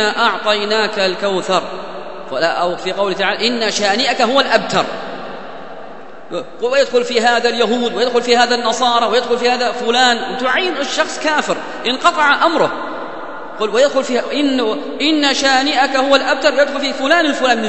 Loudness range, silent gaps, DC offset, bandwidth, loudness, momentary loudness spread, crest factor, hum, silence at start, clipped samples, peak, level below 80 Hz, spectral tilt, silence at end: 3 LU; none; 2%; 8.4 kHz; -15 LUFS; 14 LU; 16 dB; none; 0 s; under 0.1%; 0 dBFS; -58 dBFS; -2.5 dB/octave; 0 s